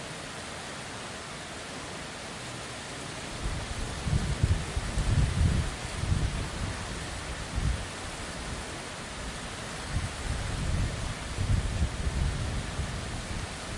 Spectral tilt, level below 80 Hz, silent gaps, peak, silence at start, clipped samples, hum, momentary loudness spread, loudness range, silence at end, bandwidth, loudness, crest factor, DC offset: -4.5 dB/octave; -36 dBFS; none; -14 dBFS; 0 s; under 0.1%; none; 9 LU; 7 LU; 0 s; 11.5 kHz; -33 LUFS; 18 dB; under 0.1%